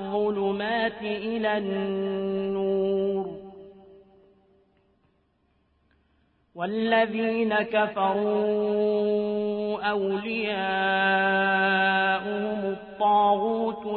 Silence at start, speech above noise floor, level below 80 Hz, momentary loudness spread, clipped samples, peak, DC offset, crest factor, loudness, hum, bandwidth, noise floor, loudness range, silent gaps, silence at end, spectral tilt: 0 s; 43 dB; -64 dBFS; 7 LU; under 0.1%; -10 dBFS; under 0.1%; 16 dB; -25 LUFS; none; 4.5 kHz; -68 dBFS; 9 LU; none; 0 s; -9.5 dB/octave